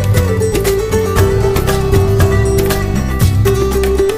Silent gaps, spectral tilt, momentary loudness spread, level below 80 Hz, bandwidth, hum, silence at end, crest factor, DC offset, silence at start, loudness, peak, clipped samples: none; -6 dB/octave; 3 LU; -20 dBFS; 16 kHz; none; 0 s; 12 dB; under 0.1%; 0 s; -13 LUFS; 0 dBFS; under 0.1%